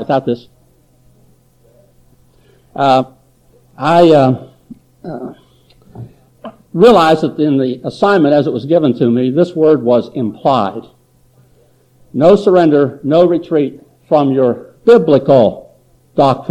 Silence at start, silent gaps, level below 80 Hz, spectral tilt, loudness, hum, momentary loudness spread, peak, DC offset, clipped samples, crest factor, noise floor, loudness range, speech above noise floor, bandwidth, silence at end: 0 s; none; -50 dBFS; -7.5 dB/octave; -12 LUFS; none; 16 LU; 0 dBFS; under 0.1%; under 0.1%; 14 dB; -51 dBFS; 4 LU; 40 dB; 12 kHz; 0 s